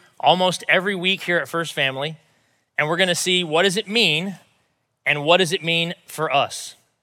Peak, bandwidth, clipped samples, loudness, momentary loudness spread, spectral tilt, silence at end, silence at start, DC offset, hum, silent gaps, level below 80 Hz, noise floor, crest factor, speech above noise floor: -2 dBFS; 17 kHz; under 0.1%; -20 LUFS; 10 LU; -3 dB/octave; 0.3 s; 0.25 s; under 0.1%; none; none; -84 dBFS; -68 dBFS; 20 dB; 48 dB